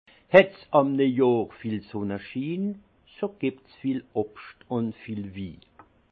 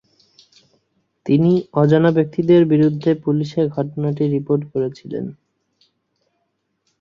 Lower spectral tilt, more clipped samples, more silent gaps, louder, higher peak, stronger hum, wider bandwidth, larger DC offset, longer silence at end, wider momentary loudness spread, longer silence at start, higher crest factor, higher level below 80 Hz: about the same, -9 dB/octave vs -9.5 dB/octave; neither; neither; second, -26 LUFS vs -18 LUFS; about the same, -2 dBFS vs -2 dBFS; neither; second, 5.8 kHz vs 7 kHz; neither; second, 0.55 s vs 1.65 s; first, 17 LU vs 13 LU; second, 0.3 s vs 1.25 s; first, 24 dB vs 16 dB; second, -66 dBFS vs -60 dBFS